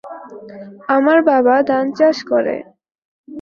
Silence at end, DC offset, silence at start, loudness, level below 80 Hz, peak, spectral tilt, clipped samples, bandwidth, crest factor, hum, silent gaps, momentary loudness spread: 0 s; under 0.1%; 0.05 s; -15 LUFS; -64 dBFS; -2 dBFS; -5.5 dB/octave; under 0.1%; 7 kHz; 16 dB; none; 2.98-3.24 s; 22 LU